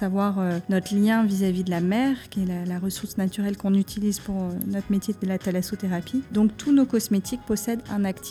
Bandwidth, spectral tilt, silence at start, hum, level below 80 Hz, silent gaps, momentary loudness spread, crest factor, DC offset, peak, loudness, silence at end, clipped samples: 16 kHz; -6 dB/octave; 0 s; none; -52 dBFS; none; 7 LU; 14 dB; under 0.1%; -10 dBFS; -25 LUFS; 0 s; under 0.1%